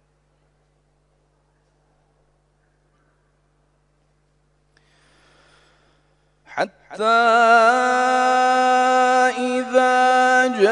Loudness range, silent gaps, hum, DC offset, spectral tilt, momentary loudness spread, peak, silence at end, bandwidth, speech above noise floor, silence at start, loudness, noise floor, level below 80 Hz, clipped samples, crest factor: 15 LU; none; 50 Hz at -65 dBFS; under 0.1%; -2.5 dB/octave; 13 LU; -4 dBFS; 0 s; 10.5 kHz; 47 dB; 6.5 s; -16 LUFS; -63 dBFS; -66 dBFS; under 0.1%; 18 dB